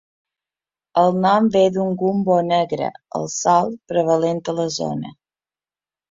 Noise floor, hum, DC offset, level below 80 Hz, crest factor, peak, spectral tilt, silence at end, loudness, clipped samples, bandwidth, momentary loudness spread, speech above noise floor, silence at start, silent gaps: under -90 dBFS; none; under 0.1%; -62 dBFS; 18 dB; -2 dBFS; -5.5 dB/octave; 1 s; -19 LUFS; under 0.1%; 7.8 kHz; 10 LU; over 72 dB; 0.95 s; none